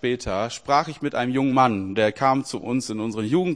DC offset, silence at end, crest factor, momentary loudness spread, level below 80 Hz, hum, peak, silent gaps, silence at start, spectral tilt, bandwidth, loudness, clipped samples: 0.1%; 0 s; 18 dB; 7 LU; -50 dBFS; none; -4 dBFS; none; 0 s; -5.5 dB/octave; 10.5 kHz; -23 LUFS; under 0.1%